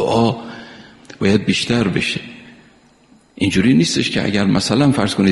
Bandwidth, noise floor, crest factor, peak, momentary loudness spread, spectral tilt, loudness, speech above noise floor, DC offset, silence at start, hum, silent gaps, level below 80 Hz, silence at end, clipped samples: 11.5 kHz; -51 dBFS; 18 dB; 0 dBFS; 13 LU; -5 dB/octave; -16 LUFS; 36 dB; under 0.1%; 0 s; none; none; -46 dBFS; 0 s; under 0.1%